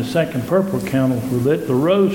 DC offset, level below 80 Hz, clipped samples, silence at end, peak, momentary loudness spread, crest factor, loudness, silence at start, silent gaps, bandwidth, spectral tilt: under 0.1%; -50 dBFS; under 0.1%; 0 s; -4 dBFS; 3 LU; 14 dB; -18 LUFS; 0 s; none; 17.5 kHz; -7 dB/octave